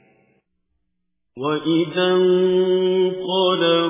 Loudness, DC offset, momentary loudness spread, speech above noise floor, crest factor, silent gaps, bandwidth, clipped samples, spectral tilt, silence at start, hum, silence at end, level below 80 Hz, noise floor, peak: -19 LUFS; under 0.1%; 6 LU; 59 dB; 14 dB; none; 3.9 kHz; under 0.1%; -10.5 dB/octave; 1.35 s; none; 0 s; -68 dBFS; -77 dBFS; -6 dBFS